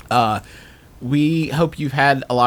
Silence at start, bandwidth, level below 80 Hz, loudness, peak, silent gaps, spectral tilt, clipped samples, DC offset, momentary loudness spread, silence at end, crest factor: 0.1 s; 19.5 kHz; -48 dBFS; -19 LUFS; -2 dBFS; none; -6.5 dB/octave; under 0.1%; under 0.1%; 7 LU; 0 s; 18 dB